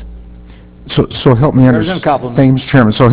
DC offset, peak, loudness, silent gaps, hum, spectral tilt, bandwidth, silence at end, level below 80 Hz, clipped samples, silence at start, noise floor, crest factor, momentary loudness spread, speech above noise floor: under 0.1%; 0 dBFS; -11 LUFS; none; none; -11.5 dB/octave; 4 kHz; 0 s; -32 dBFS; 0.4%; 0 s; -34 dBFS; 10 dB; 7 LU; 25 dB